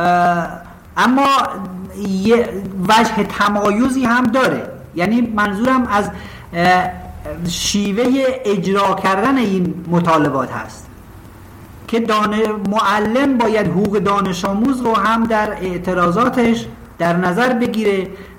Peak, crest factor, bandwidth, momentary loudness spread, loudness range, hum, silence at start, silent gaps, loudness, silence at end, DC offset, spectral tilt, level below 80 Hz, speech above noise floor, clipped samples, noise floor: -4 dBFS; 14 dB; 16.5 kHz; 11 LU; 3 LU; none; 0 s; none; -16 LUFS; 0 s; under 0.1%; -5.5 dB/octave; -42 dBFS; 22 dB; under 0.1%; -37 dBFS